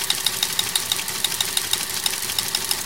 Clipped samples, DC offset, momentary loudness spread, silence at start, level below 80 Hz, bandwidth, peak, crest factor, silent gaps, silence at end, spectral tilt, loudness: under 0.1%; 0.5%; 2 LU; 0 s; -54 dBFS; 17.5 kHz; -2 dBFS; 22 dB; none; 0 s; 0.5 dB/octave; -21 LUFS